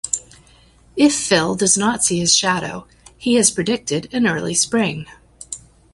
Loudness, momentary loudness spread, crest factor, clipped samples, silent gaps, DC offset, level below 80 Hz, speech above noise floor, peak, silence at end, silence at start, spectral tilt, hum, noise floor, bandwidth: -17 LUFS; 18 LU; 18 dB; under 0.1%; none; under 0.1%; -52 dBFS; 33 dB; -2 dBFS; 0.35 s; 0.05 s; -3 dB/octave; none; -50 dBFS; 11.5 kHz